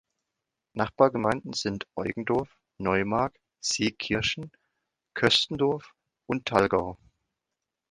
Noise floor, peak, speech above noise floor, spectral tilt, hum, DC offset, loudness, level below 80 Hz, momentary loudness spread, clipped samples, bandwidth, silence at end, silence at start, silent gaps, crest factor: -86 dBFS; -4 dBFS; 60 dB; -4 dB/octave; none; under 0.1%; -27 LUFS; -56 dBFS; 13 LU; under 0.1%; 11.5 kHz; 0.95 s; 0.75 s; none; 24 dB